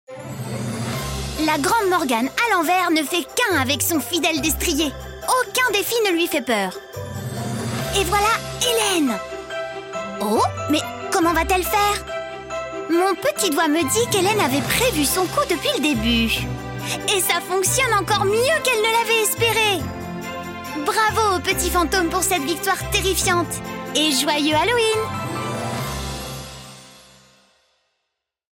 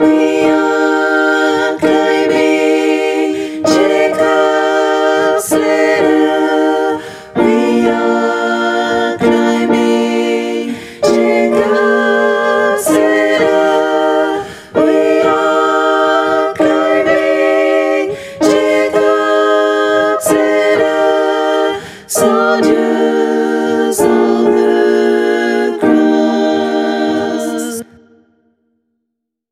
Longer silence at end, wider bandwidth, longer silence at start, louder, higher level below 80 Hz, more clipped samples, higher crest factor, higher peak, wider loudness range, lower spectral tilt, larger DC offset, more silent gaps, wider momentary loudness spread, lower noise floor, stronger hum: second, 1.55 s vs 1.7 s; about the same, 17 kHz vs 15.5 kHz; about the same, 0.1 s vs 0 s; second, -20 LUFS vs -12 LUFS; first, -40 dBFS vs -56 dBFS; neither; about the same, 16 dB vs 12 dB; second, -6 dBFS vs 0 dBFS; about the same, 3 LU vs 2 LU; about the same, -3 dB/octave vs -4 dB/octave; neither; neither; first, 12 LU vs 4 LU; first, -78 dBFS vs -74 dBFS; neither